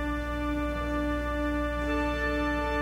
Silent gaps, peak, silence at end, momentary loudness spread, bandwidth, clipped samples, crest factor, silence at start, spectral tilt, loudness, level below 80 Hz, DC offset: none; -16 dBFS; 0 s; 3 LU; 16 kHz; under 0.1%; 12 dB; 0 s; -6.5 dB/octave; -30 LUFS; -34 dBFS; under 0.1%